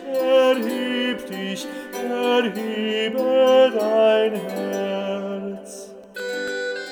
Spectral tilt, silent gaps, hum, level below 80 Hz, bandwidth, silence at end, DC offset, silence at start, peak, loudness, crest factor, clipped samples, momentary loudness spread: -4.5 dB/octave; none; none; -70 dBFS; 18 kHz; 0 s; under 0.1%; 0 s; -4 dBFS; -21 LUFS; 16 dB; under 0.1%; 14 LU